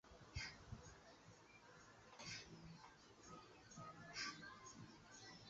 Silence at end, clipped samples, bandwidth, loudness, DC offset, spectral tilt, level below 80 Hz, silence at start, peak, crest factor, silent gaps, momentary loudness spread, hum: 0 s; under 0.1%; 8 kHz; -57 LUFS; under 0.1%; -2.5 dB/octave; -70 dBFS; 0.05 s; -36 dBFS; 22 dB; none; 14 LU; none